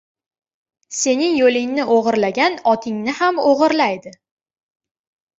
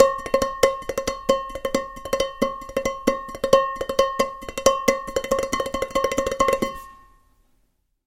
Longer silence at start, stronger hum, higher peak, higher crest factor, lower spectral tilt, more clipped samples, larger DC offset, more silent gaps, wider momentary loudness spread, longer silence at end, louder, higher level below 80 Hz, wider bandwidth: first, 0.9 s vs 0 s; neither; about the same, -2 dBFS vs 0 dBFS; second, 16 dB vs 24 dB; about the same, -3 dB/octave vs -3 dB/octave; neither; neither; neither; about the same, 6 LU vs 8 LU; first, 1.3 s vs 1.1 s; first, -17 LUFS vs -23 LUFS; second, -64 dBFS vs -44 dBFS; second, 8 kHz vs 16.5 kHz